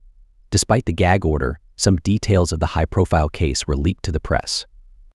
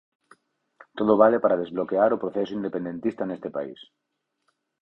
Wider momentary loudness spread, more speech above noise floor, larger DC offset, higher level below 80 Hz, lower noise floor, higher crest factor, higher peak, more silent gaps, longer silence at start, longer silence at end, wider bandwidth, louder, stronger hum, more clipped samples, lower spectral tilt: second, 6 LU vs 14 LU; second, 30 dB vs 50 dB; neither; first, -30 dBFS vs -66 dBFS; second, -48 dBFS vs -74 dBFS; second, 16 dB vs 22 dB; about the same, -2 dBFS vs -4 dBFS; neither; second, 0.5 s vs 0.95 s; second, 0.5 s vs 1 s; first, 12.5 kHz vs 6 kHz; first, -20 LUFS vs -24 LUFS; neither; neither; second, -5 dB/octave vs -8.5 dB/octave